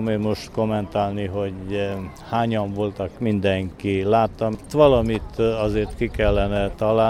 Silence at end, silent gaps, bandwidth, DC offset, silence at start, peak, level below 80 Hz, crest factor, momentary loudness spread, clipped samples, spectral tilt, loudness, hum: 0 s; none; 13 kHz; under 0.1%; 0 s; -2 dBFS; -36 dBFS; 20 dB; 9 LU; under 0.1%; -7.5 dB/octave; -22 LUFS; none